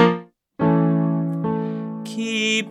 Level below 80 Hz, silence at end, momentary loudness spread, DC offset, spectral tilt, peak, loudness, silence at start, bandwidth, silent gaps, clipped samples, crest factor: -60 dBFS; 0 s; 11 LU; under 0.1%; -5.5 dB/octave; -2 dBFS; -22 LUFS; 0 s; 11 kHz; none; under 0.1%; 20 dB